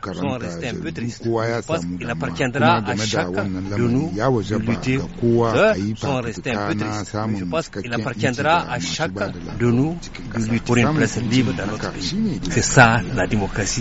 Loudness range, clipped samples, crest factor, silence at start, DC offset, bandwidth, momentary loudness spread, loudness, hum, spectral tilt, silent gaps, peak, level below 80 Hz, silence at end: 4 LU; under 0.1%; 20 dB; 0 s; under 0.1%; 8 kHz; 9 LU; -21 LUFS; none; -5 dB/octave; none; 0 dBFS; -38 dBFS; 0 s